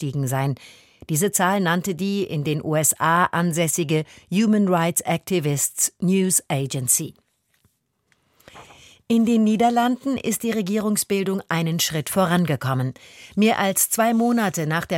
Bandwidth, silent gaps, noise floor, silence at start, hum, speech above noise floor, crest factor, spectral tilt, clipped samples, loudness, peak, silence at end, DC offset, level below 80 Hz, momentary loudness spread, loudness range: 17 kHz; none; -67 dBFS; 0 s; none; 46 dB; 18 dB; -4.5 dB/octave; under 0.1%; -21 LUFS; -4 dBFS; 0 s; under 0.1%; -60 dBFS; 6 LU; 3 LU